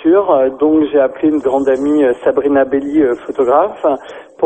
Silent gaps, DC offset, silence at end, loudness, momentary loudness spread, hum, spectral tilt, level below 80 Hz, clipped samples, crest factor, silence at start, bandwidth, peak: none; 0.1%; 0 s; -13 LUFS; 5 LU; none; -7 dB/octave; -50 dBFS; under 0.1%; 12 dB; 0 s; 8.6 kHz; 0 dBFS